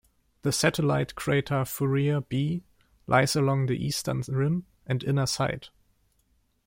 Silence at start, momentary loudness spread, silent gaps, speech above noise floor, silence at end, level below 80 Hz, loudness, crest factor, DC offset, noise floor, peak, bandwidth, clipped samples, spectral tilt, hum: 0.45 s; 8 LU; none; 43 dB; 1 s; -56 dBFS; -27 LUFS; 20 dB; under 0.1%; -69 dBFS; -6 dBFS; 16.5 kHz; under 0.1%; -5.5 dB/octave; none